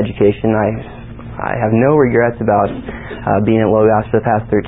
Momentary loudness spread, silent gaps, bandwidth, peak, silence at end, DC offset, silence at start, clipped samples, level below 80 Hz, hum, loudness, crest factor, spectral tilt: 15 LU; none; 4 kHz; 0 dBFS; 0 s; 0.5%; 0 s; under 0.1%; -36 dBFS; none; -14 LUFS; 14 dB; -13.5 dB/octave